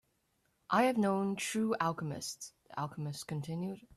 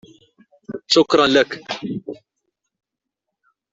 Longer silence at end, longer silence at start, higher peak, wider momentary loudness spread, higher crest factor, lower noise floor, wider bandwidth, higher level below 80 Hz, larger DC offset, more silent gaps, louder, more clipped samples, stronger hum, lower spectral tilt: second, 0.1 s vs 1.6 s; about the same, 0.7 s vs 0.7 s; second, -16 dBFS vs -2 dBFS; second, 12 LU vs 21 LU; about the same, 18 dB vs 20 dB; second, -77 dBFS vs -82 dBFS; first, 14 kHz vs 8 kHz; second, -74 dBFS vs -62 dBFS; neither; neither; second, -35 LUFS vs -17 LUFS; neither; neither; first, -5 dB/octave vs -3.5 dB/octave